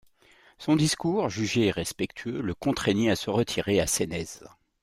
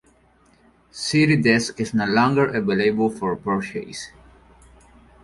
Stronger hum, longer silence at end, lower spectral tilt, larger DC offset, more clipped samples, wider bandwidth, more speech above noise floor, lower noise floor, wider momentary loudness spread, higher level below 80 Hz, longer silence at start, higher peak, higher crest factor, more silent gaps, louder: neither; second, 0.35 s vs 1.15 s; about the same, -4.5 dB/octave vs -5.5 dB/octave; neither; neither; first, 16 kHz vs 11.5 kHz; second, 32 dB vs 37 dB; about the same, -59 dBFS vs -57 dBFS; second, 8 LU vs 16 LU; about the same, -54 dBFS vs -54 dBFS; second, 0.6 s vs 0.95 s; second, -10 dBFS vs -4 dBFS; about the same, 18 dB vs 18 dB; neither; second, -27 LUFS vs -20 LUFS